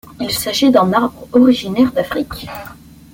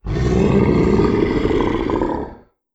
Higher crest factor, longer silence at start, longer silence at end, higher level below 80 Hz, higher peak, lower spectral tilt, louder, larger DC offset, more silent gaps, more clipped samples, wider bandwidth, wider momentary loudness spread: about the same, 14 dB vs 14 dB; about the same, 0.05 s vs 0.05 s; about the same, 0.4 s vs 0.4 s; second, -44 dBFS vs -28 dBFS; about the same, -2 dBFS vs -4 dBFS; second, -5 dB/octave vs -8 dB/octave; about the same, -15 LUFS vs -17 LUFS; neither; neither; neither; first, 17 kHz vs 8 kHz; first, 17 LU vs 8 LU